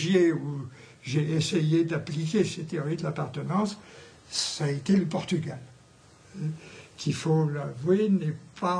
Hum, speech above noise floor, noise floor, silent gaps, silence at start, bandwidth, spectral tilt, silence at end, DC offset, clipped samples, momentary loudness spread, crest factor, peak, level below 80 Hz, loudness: none; 28 dB; -55 dBFS; none; 0 s; 10.5 kHz; -6 dB/octave; 0 s; under 0.1%; under 0.1%; 15 LU; 16 dB; -10 dBFS; -66 dBFS; -28 LUFS